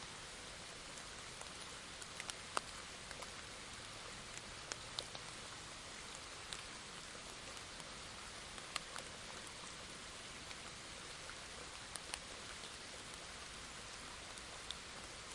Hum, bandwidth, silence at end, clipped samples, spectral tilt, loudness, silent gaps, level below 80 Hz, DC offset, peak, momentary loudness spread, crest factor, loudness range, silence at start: none; 11.5 kHz; 0 s; under 0.1%; -1.5 dB/octave; -49 LUFS; none; -66 dBFS; under 0.1%; -18 dBFS; 4 LU; 32 dB; 1 LU; 0 s